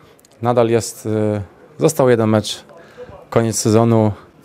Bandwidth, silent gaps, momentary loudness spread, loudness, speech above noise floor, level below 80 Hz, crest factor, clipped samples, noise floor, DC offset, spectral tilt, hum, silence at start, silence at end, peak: 16 kHz; none; 11 LU; -17 LUFS; 23 dB; -54 dBFS; 18 dB; under 0.1%; -38 dBFS; under 0.1%; -6 dB/octave; none; 0.4 s; 0.25 s; 0 dBFS